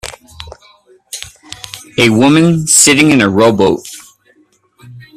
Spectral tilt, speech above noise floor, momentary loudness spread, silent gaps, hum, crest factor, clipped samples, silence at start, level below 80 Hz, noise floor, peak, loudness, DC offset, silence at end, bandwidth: -3.5 dB/octave; 43 dB; 25 LU; none; none; 12 dB; 0.1%; 0.05 s; -46 dBFS; -52 dBFS; 0 dBFS; -9 LUFS; under 0.1%; 0.15 s; over 20 kHz